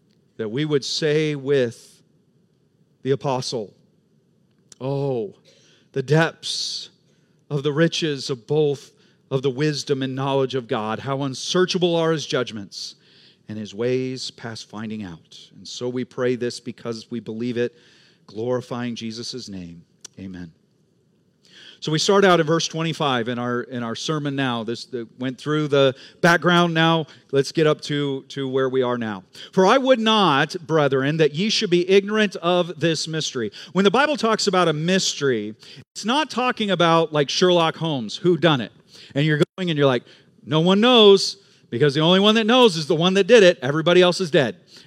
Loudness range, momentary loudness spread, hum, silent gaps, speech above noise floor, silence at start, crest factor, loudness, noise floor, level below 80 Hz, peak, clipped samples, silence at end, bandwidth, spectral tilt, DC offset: 12 LU; 16 LU; none; 35.87-35.95 s, 39.49-39.53 s; 42 dB; 0.4 s; 20 dB; -20 LUFS; -62 dBFS; -74 dBFS; -2 dBFS; under 0.1%; 0.05 s; 13.5 kHz; -5 dB/octave; under 0.1%